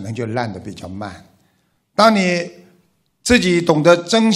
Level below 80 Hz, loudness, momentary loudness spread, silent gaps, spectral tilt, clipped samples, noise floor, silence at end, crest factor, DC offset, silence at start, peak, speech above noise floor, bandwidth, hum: -46 dBFS; -16 LUFS; 18 LU; none; -5 dB/octave; under 0.1%; -63 dBFS; 0 s; 18 dB; under 0.1%; 0 s; 0 dBFS; 47 dB; 14.5 kHz; none